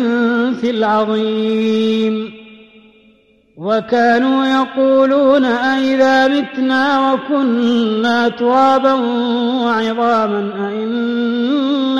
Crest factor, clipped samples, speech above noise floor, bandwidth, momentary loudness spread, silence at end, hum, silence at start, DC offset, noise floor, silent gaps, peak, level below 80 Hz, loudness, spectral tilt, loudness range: 12 dB; under 0.1%; 38 dB; 7.6 kHz; 7 LU; 0 s; none; 0 s; under 0.1%; -51 dBFS; none; -2 dBFS; -60 dBFS; -14 LUFS; -5.5 dB/octave; 4 LU